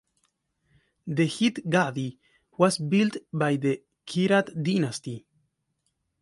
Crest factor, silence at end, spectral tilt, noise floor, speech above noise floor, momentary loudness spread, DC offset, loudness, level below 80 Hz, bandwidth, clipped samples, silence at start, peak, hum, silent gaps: 22 dB; 1 s; -5.5 dB/octave; -77 dBFS; 52 dB; 13 LU; under 0.1%; -26 LUFS; -70 dBFS; 11.5 kHz; under 0.1%; 1.05 s; -6 dBFS; none; none